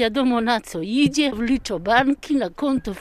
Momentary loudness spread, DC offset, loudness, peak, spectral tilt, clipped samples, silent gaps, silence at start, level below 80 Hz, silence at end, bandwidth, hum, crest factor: 5 LU; under 0.1%; -21 LUFS; -4 dBFS; -4.5 dB/octave; under 0.1%; none; 0 s; -44 dBFS; 0 s; 14 kHz; none; 18 dB